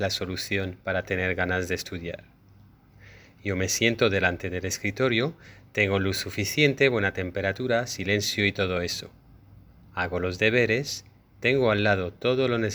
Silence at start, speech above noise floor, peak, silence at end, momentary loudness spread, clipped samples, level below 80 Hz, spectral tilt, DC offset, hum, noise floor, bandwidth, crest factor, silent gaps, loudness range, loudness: 0 s; 29 dB; -6 dBFS; 0 s; 10 LU; under 0.1%; -54 dBFS; -4.5 dB/octave; under 0.1%; none; -54 dBFS; over 20 kHz; 22 dB; none; 4 LU; -26 LUFS